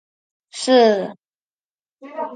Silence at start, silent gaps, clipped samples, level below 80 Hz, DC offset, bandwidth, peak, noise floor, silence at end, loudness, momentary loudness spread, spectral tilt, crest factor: 0.55 s; 1.35-1.57 s, 1.64-1.76 s, 1.92-1.97 s; under 0.1%; -76 dBFS; under 0.1%; 9.6 kHz; -4 dBFS; under -90 dBFS; 0 s; -16 LUFS; 22 LU; -4 dB/octave; 18 dB